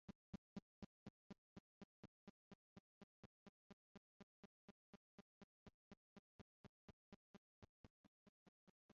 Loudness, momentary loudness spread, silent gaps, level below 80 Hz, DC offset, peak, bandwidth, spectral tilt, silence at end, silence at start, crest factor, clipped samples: -65 LUFS; 10 LU; 0.15-0.56 s, 0.62-1.30 s, 1.38-5.66 s, 5.74-5.91 s, 5.97-7.62 s, 7.69-7.84 s, 7.90-8.89 s; -82 dBFS; under 0.1%; -40 dBFS; 7.2 kHz; -6.5 dB/octave; 0.1 s; 0.1 s; 26 dB; under 0.1%